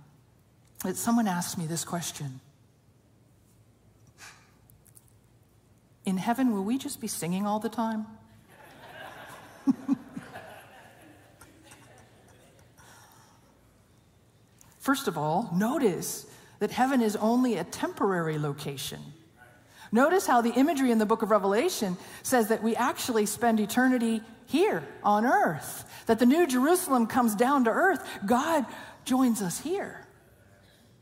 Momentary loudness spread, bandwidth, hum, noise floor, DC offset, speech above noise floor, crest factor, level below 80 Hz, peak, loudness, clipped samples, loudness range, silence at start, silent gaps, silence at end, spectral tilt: 15 LU; 16 kHz; none; -61 dBFS; under 0.1%; 35 dB; 18 dB; -68 dBFS; -10 dBFS; -27 LUFS; under 0.1%; 12 LU; 0.8 s; none; 0.95 s; -4.5 dB/octave